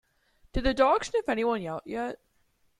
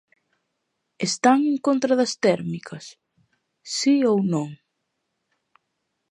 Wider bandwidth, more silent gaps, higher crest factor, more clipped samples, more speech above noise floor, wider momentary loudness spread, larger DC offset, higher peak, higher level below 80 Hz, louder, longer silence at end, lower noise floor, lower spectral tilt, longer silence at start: about the same, 11.5 kHz vs 11 kHz; neither; about the same, 20 dB vs 20 dB; neither; second, 42 dB vs 56 dB; second, 13 LU vs 16 LU; neither; second, -8 dBFS vs -4 dBFS; first, -44 dBFS vs -72 dBFS; second, -28 LUFS vs -21 LUFS; second, 0.65 s vs 1.55 s; second, -69 dBFS vs -77 dBFS; about the same, -5 dB/octave vs -5 dB/octave; second, 0.55 s vs 1 s